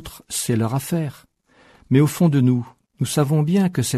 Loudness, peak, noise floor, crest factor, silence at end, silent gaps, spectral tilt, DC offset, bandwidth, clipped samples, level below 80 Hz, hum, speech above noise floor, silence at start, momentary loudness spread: -20 LUFS; -4 dBFS; -54 dBFS; 16 dB; 0 s; none; -6 dB/octave; under 0.1%; 13.5 kHz; under 0.1%; -54 dBFS; none; 36 dB; 0 s; 11 LU